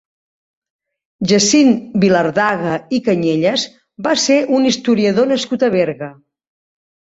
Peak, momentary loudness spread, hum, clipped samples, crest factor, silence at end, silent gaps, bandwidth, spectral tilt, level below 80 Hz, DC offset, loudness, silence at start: -2 dBFS; 9 LU; none; under 0.1%; 14 dB; 1.05 s; none; 8 kHz; -4 dB/octave; -56 dBFS; under 0.1%; -15 LUFS; 1.2 s